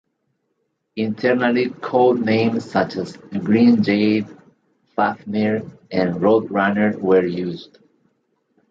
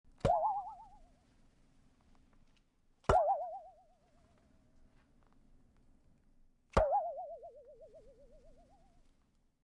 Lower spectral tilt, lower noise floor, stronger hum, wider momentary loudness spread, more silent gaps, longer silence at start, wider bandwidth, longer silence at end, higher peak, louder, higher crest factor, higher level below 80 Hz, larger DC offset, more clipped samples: first, -8 dB/octave vs -6.5 dB/octave; about the same, -72 dBFS vs -73 dBFS; neither; second, 12 LU vs 20 LU; neither; first, 0.95 s vs 0.25 s; second, 7.4 kHz vs 10.5 kHz; second, 1.1 s vs 1.65 s; first, -2 dBFS vs -14 dBFS; first, -19 LUFS vs -35 LUFS; second, 16 dB vs 26 dB; second, -60 dBFS vs -52 dBFS; neither; neither